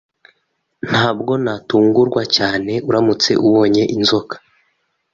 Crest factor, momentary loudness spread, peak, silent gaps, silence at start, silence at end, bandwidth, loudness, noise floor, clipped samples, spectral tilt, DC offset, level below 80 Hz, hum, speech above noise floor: 16 dB; 7 LU; 0 dBFS; none; 0.85 s; 0.75 s; 7.6 kHz; -15 LUFS; -68 dBFS; under 0.1%; -5 dB/octave; under 0.1%; -52 dBFS; none; 53 dB